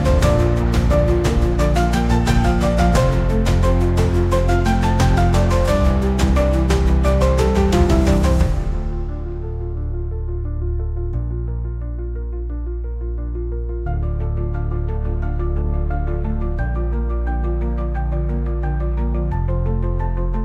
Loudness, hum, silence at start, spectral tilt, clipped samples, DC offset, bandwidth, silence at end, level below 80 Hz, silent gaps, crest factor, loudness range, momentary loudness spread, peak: -20 LUFS; none; 0 s; -7 dB/octave; under 0.1%; under 0.1%; 13.5 kHz; 0 s; -20 dBFS; none; 14 dB; 9 LU; 10 LU; -2 dBFS